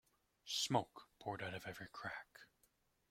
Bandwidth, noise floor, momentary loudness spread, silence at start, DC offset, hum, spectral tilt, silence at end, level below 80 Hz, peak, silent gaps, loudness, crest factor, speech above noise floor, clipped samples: 16.5 kHz; -79 dBFS; 22 LU; 0.45 s; under 0.1%; none; -3 dB/octave; 0.65 s; -78 dBFS; -20 dBFS; none; -44 LUFS; 26 dB; 34 dB; under 0.1%